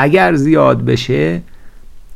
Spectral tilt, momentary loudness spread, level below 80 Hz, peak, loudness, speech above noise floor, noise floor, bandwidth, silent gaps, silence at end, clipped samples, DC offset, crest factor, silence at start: -7 dB/octave; 7 LU; -36 dBFS; 0 dBFS; -12 LUFS; 20 dB; -32 dBFS; 14 kHz; none; 0 s; under 0.1%; under 0.1%; 12 dB; 0 s